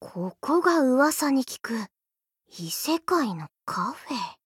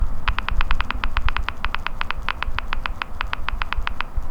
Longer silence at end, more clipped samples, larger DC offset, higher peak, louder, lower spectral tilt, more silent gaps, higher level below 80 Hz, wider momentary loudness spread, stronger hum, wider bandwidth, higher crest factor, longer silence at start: about the same, 0.1 s vs 0 s; neither; neither; second, -8 dBFS vs 0 dBFS; about the same, -25 LUFS vs -27 LUFS; about the same, -4 dB/octave vs -5 dB/octave; neither; second, -74 dBFS vs -24 dBFS; first, 13 LU vs 4 LU; neither; first, 18 kHz vs 5.6 kHz; about the same, 18 dB vs 20 dB; about the same, 0 s vs 0 s